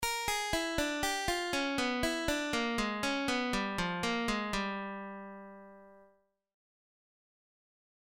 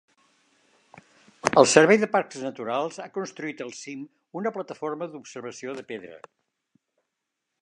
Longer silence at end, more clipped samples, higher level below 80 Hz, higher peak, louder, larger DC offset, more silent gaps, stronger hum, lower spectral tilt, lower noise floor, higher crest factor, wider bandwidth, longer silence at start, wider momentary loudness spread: first, 2 s vs 1.45 s; neither; first, -52 dBFS vs -72 dBFS; second, -18 dBFS vs 0 dBFS; second, -33 LUFS vs -24 LUFS; neither; neither; neither; about the same, -3 dB/octave vs -3.5 dB/octave; second, -69 dBFS vs -83 dBFS; second, 18 dB vs 26 dB; first, 17 kHz vs 11.5 kHz; second, 0 s vs 1.45 s; second, 12 LU vs 21 LU